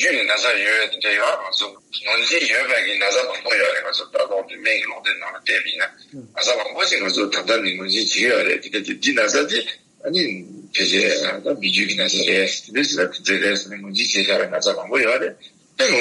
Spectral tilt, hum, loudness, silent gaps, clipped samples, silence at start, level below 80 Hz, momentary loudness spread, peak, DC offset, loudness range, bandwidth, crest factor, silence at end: -1.5 dB/octave; none; -19 LUFS; none; under 0.1%; 0 s; -72 dBFS; 7 LU; -4 dBFS; under 0.1%; 2 LU; 11.5 kHz; 16 dB; 0 s